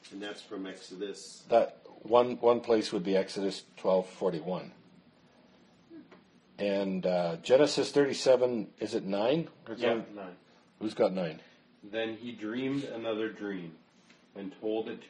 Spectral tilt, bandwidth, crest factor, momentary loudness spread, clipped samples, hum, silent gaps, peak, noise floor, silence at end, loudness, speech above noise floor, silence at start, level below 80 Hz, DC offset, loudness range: -5.5 dB/octave; 10.5 kHz; 24 dB; 16 LU; under 0.1%; none; none; -8 dBFS; -62 dBFS; 0 s; -31 LUFS; 31 dB; 0.05 s; -78 dBFS; under 0.1%; 8 LU